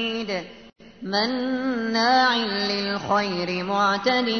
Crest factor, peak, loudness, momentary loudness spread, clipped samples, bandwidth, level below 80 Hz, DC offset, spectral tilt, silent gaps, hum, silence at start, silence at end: 16 dB; -8 dBFS; -23 LUFS; 10 LU; under 0.1%; 6.6 kHz; -62 dBFS; 0.1%; -4.5 dB/octave; none; none; 0 s; 0 s